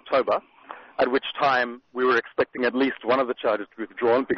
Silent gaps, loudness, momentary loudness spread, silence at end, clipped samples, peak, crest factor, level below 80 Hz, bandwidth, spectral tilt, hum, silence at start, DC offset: none; -24 LUFS; 8 LU; 0 s; under 0.1%; -8 dBFS; 16 dB; -64 dBFS; 6.4 kHz; -2 dB/octave; none; 0.05 s; under 0.1%